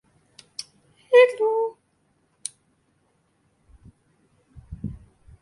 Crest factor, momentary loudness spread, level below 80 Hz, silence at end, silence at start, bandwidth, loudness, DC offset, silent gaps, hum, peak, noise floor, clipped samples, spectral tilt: 22 dB; 22 LU; -54 dBFS; 0.45 s; 0.6 s; 11.5 kHz; -21 LUFS; under 0.1%; none; none; -6 dBFS; -67 dBFS; under 0.1%; -3.5 dB/octave